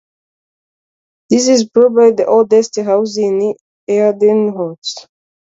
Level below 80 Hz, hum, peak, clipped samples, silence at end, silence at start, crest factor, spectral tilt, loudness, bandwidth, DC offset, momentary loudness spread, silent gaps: -62 dBFS; none; 0 dBFS; under 0.1%; 0.45 s; 1.3 s; 14 dB; -4.5 dB/octave; -13 LUFS; 7.8 kHz; under 0.1%; 12 LU; 3.61-3.87 s, 4.78-4.82 s